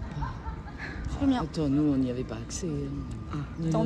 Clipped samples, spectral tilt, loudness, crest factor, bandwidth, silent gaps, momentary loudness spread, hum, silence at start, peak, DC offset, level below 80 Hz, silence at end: under 0.1%; -6.5 dB/octave; -31 LUFS; 16 dB; 10.5 kHz; none; 12 LU; none; 0 s; -14 dBFS; under 0.1%; -42 dBFS; 0 s